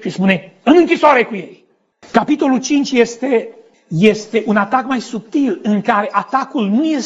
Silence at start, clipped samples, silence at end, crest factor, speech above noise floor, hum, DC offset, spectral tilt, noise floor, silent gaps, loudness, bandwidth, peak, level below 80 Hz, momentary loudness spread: 0 s; under 0.1%; 0 s; 14 dB; 33 dB; none; under 0.1%; -5.5 dB/octave; -47 dBFS; none; -15 LUFS; 8 kHz; 0 dBFS; -58 dBFS; 9 LU